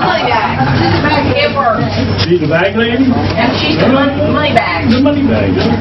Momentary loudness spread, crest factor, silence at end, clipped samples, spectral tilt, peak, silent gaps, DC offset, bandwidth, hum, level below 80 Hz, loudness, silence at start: 2 LU; 10 dB; 0 s; 0.1%; -7.5 dB/octave; 0 dBFS; none; under 0.1%; 6.2 kHz; none; -32 dBFS; -11 LUFS; 0 s